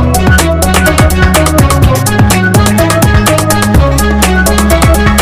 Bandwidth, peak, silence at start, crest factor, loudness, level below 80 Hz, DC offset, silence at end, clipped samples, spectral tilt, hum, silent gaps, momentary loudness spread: 16 kHz; 0 dBFS; 0 s; 6 dB; -7 LUFS; -14 dBFS; under 0.1%; 0 s; 2%; -5 dB/octave; none; none; 1 LU